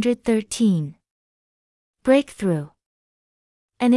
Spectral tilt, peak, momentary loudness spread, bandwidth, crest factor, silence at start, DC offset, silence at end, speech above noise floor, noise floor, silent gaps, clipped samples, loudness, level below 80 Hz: -6 dB/octave; -4 dBFS; 9 LU; 12 kHz; 18 dB; 0 s; under 0.1%; 0 s; over 70 dB; under -90 dBFS; 1.11-1.94 s, 2.86-3.69 s; under 0.1%; -22 LUFS; -58 dBFS